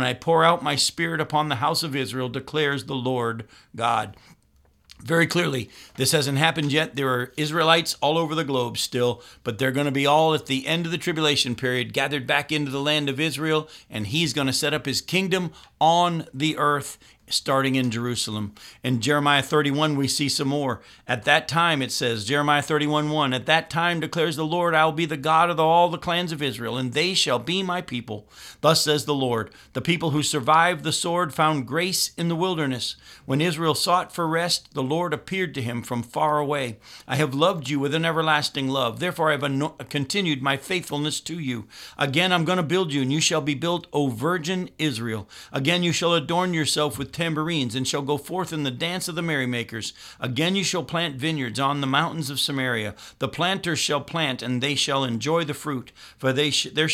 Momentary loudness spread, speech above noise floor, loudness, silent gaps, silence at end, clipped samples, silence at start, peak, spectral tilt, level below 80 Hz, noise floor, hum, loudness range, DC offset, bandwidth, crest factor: 9 LU; 37 dB; -23 LUFS; none; 0 s; under 0.1%; 0 s; -2 dBFS; -4 dB/octave; -60 dBFS; -60 dBFS; none; 4 LU; under 0.1%; 16.5 kHz; 22 dB